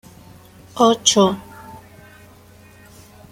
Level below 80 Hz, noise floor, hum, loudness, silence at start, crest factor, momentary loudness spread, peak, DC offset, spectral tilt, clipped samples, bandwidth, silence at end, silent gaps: -56 dBFS; -46 dBFS; none; -15 LUFS; 0.75 s; 20 dB; 26 LU; -2 dBFS; under 0.1%; -3.5 dB/octave; under 0.1%; 16.5 kHz; 1.55 s; none